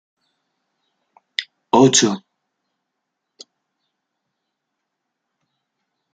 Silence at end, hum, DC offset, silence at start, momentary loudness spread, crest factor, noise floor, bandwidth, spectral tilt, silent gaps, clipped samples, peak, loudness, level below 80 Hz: 3.95 s; none; under 0.1%; 1.4 s; 15 LU; 22 dB; -78 dBFS; 10 kHz; -3.5 dB/octave; none; under 0.1%; -2 dBFS; -16 LUFS; -66 dBFS